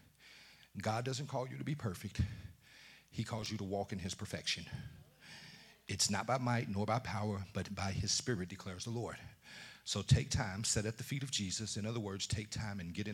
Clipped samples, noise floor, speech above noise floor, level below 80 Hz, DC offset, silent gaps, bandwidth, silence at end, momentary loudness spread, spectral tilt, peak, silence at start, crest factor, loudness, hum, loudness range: under 0.1%; -61 dBFS; 22 dB; -60 dBFS; under 0.1%; none; 16.5 kHz; 0 s; 19 LU; -4 dB/octave; -16 dBFS; 0.2 s; 22 dB; -38 LUFS; none; 5 LU